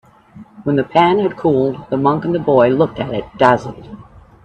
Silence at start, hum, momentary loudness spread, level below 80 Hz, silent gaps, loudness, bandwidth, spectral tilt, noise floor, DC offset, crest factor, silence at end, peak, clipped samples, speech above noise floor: 0.35 s; none; 10 LU; -48 dBFS; none; -15 LUFS; 8.4 kHz; -8 dB/octave; -41 dBFS; under 0.1%; 16 dB; 0.45 s; 0 dBFS; under 0.1%; 26 dB